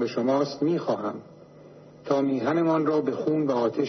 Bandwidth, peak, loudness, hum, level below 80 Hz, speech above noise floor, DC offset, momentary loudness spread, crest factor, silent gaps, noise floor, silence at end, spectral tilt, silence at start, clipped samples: 6.4 kHz; -10 dBFS; -25 LUFS; none; -72 dBFS; 24 dB; under 0.1%; 7 LU; 14 dB; none; -48 dBFS; 0 s; -7.5 dB/octave; 0 s; under 0.1%